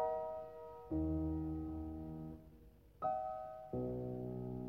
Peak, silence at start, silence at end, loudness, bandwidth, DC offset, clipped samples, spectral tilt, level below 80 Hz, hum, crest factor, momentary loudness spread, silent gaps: -28 dBFS; 0 s; 0 s; -43 LUFS; 14.5 kHz; under 0.1%; under 0.1%; -11 dB/octave; -54 dBFS; none; 14 dB; 12 LU; none